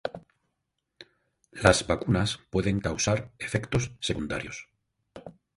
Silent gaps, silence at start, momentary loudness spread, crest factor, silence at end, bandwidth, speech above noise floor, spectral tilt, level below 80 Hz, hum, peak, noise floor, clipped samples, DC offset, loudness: none; 0.05 s; 25 LU; 26 dB; 0.25 s; 11.5 kHz; 54 dB; -4.5 dB/octave; -46 dBFS; none; -4 dBFS; -81 dBFS; under 0.1%; under 0.1%; -27 LUFS